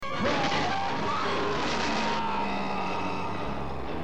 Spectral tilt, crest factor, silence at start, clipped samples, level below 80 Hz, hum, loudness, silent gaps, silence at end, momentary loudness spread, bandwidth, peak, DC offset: -4.5 dB/octave; 14 dB; 0 s; under 0.1%; -48 dBFS; none; -29 LUFS; none; 0 s; 6 LU; 11 kHz; -14 dBFS; 2%